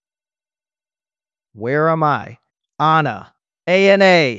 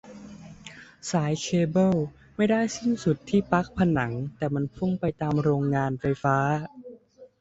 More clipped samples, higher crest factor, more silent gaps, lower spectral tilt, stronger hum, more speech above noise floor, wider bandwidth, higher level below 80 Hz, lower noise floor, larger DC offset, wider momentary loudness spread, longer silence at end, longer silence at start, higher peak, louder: neither; about the same, 18 dB vs 20 dB; neither; about the same, -6 dB/octave vs -6.5 dB/octave; neither; first, over 75 dB vs 25 dB; about the same, 7.8 kHz vs 8 kHz; second, -72 dBFS vs -54 dBFS; first, under -90 dBFS vs -50 dBFS; neither; second, 17 LU vs 20 LU; second, 0 s vs 0.15 s; first, 1.55 s vs 0.05 s; first, 0 dBFS vs -6 dBFS; first, -15 LUFS vs -26 LUFS